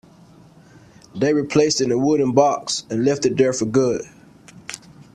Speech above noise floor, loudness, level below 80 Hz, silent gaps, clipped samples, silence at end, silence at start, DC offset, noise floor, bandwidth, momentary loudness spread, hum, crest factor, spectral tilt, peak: 30 dB; -19 LUFS; -56 dBFS; none; under 0.1%; 0.4 s; 1.15 s; under 0.1%; -48 dBFS; 12 kHz; 18 LU; none; 20 dB; -5 dB/octave; -2 dBFS